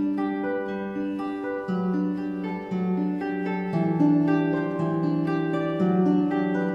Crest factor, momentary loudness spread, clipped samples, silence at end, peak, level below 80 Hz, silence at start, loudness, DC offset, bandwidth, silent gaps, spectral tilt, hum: 14 dB; 8 LU; under 0.1%; 0 s; -10 dBFS; -64 dBFS; 0 s; -25 LUFS; under 0.1%; 6 kHz; none; -9.5 dB/octave; none